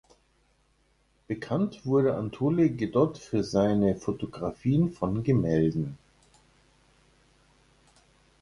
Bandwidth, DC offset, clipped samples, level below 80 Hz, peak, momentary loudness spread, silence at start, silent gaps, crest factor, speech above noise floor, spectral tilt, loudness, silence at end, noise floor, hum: 11.5 kHz; under 0.1%; under 0.1%; -54 dBFS; -10 dBFS; 9 LU; 1.3 s; none; 18 dB; 41 dB; -8.5 dB/octave; -27 LUFS; 2.45 s; -67 dBFS; 60 Hz at -55 dBFS